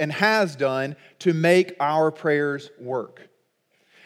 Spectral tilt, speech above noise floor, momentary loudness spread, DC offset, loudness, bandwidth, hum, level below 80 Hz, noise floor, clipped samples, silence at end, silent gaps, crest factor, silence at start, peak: -6 dB/octave; 45 dB; 12 LU; under 0.1%; -22 LUFS; 15 kHz; none; -84 dBFS; -67 dBFS; under 0.1%; 1 s; none; 20 dB; 0 s; -4 dBFS